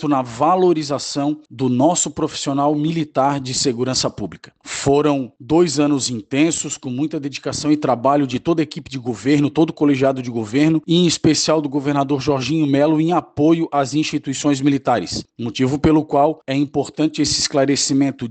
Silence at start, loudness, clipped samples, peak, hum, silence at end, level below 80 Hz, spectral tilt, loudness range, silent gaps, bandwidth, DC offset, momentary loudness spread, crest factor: 0 s; -18 LUFS; under 0.1%; -4 dBFS; none; 0 s; -50 dBFS; -5 dB/octave; 2 LU; none; 9.2 kHz; under 0.1%; 8 LU; 14 dB